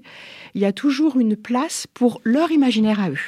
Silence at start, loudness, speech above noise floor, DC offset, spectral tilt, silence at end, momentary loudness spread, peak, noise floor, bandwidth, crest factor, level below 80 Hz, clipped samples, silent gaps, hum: 0.05 s; -19 LUFS; 22 dB; under 0.1%; -5 dB/octave; 0 s; 10 LU; -6 dBFS; -41 dBFS; 14.5 kHz; 14 dB; -66 dBFS; under 0.1%; none; none